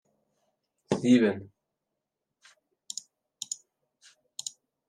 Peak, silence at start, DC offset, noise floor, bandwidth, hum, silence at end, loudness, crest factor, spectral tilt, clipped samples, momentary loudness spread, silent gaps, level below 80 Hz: -10 dBFS; 0.9 s; under 0.1%; -85 dBFS; 12.5 kHz; none; 0.4 s; -29 LUFS; 22 dB; -4.5 dB/octave; under 0.1%; 18 LU; none; -78 dBFS